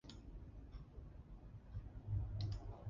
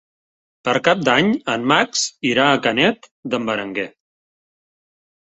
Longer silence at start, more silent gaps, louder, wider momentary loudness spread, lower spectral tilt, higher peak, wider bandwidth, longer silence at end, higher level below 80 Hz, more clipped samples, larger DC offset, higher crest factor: second, 0.05 s vs 0.65 s; second, none vs 3.11-3.23 s; second, -50 LUFS vs -18 LUFS; about the same, 13 LU vs 11 LU; first, -7.5 dB/octave vs -3.5 dB/octave; second, -30 dBFS vs -2 dBFS; second, 7.2 kHz vs 8.2 kHz; second, 0 s vs 1.4 s; first, -52 dBFS vs -60 dBFS; neither; neither; about the same, 18 dB vs 18 dB